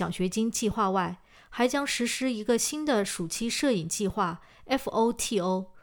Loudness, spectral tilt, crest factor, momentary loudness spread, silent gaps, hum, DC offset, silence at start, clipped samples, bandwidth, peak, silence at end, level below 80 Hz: -28 LUFS; -4 dB/octave; 18 dB; 5 LU; none; none; under 0.1%; 0 s; under 0.1%; over 20 kHz; -12 dBFS; 0.05 s; -54 dBFS